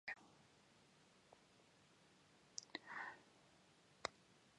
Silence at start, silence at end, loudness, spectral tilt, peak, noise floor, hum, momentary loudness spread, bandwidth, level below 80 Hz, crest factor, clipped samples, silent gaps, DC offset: 0.05 s; 0 s; -53 LUFS; -1.5 dB/octave; -24 dBFS; -72 dBFS; none; 18 LU; 11 kHz; -88 dBFS; 36 dB; under 0.1%; none; under 0.1%